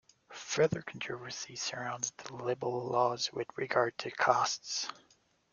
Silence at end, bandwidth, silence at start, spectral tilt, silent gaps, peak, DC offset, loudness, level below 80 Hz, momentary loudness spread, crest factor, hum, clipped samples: 0.6 s; 10 kHz; 0.3 s; -3 dB/octave; none; -12 dBFS; under 0.1%; -34 LUFS; -72 dBFS; 10 LU; 24 dB; none; under 0.1%